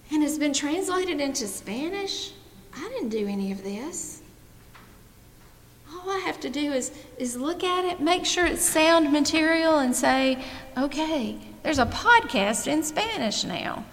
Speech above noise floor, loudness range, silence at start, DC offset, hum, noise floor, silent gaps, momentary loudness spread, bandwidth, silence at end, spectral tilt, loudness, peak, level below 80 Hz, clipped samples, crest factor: 26 dB; 12 LU; 0.05 s; under 0.1%; none; -51 dBFS; none; 15 LU; 17 kHz; 0 s; -3 dB/octave; -25 LUFS; -4 dBFS; -50 dBFS; under 0.1%; 22 dB